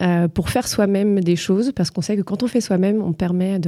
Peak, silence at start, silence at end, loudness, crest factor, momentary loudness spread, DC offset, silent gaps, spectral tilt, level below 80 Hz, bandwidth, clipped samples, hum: -6 dBFS; 0 s; 0 s; -19 LUFS; 14 dB; 4 LU; under 0.1%; none; -6 dB/octave; -44 dBFS; 15 kHz; under 0.1%; none